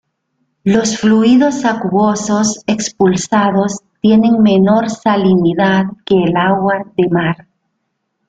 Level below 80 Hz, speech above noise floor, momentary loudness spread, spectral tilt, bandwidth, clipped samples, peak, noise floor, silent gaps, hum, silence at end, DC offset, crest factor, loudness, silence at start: -50 dBFS; 58 dB; 7 LU; -5.5 dB/octave; 9.2 kHz; under 0.1%; -2 dBFS; -69 dBFS; none; none; 0.95 s; under 0.1%; 12 dB; -13 LUFS; 0.65 s